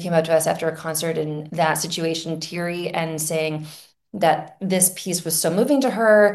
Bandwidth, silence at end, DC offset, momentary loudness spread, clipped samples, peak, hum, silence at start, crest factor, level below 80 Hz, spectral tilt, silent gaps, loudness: 13 kHz; 0 s; under 0.1%; 8 LU; under 0.1%; -2 dBFS; none; 0 s; 18 dB; -68 dBFS; -4 dB/octave; none; -21 LUFS